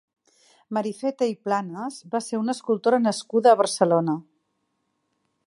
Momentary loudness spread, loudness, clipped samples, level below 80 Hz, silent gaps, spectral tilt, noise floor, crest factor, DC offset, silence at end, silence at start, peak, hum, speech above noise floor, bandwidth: 12 LU; -23 LUFS; under 0.1%; -76 dBFS; none; -5 dB/octave; -74 dBFS; 20 dB; under 0.1%; 1.25 s; 0.7 s; -4 dBFS; none; 52 dB; 11.5 kHz